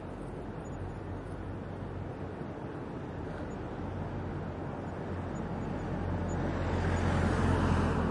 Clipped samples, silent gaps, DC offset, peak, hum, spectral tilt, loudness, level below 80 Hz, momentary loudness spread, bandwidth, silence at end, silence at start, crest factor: under 0.1%; none; under 0.1%; -16 dBFS; none; -7.5 dB/octave; -35 LUFS; -46 dBFS; 11 LU; 11 kHz; 0 s; 0 s; 18 dB